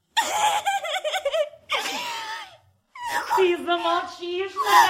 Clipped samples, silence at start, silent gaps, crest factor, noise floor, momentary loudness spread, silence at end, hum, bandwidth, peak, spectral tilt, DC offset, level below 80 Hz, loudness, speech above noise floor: under 0.1%; 0.15 s; none; 22 dB; -52 dBFS; 10 LU; 0 s; none; 16.5 kHz; -2 dBFS; -1 dB/octave; under 0.1%; -68 dBFS; -24 LUFS; 31 dB